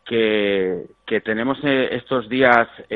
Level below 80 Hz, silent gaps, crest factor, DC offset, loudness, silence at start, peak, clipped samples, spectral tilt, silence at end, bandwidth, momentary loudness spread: -56 dBFS; none; 20 dB; under 0.1%; -19 LUFS; 0.05 s; 0 dBFS; under 0.1%; -7.5 dB/octave; 0 s; 5.4 kHz; 10 LU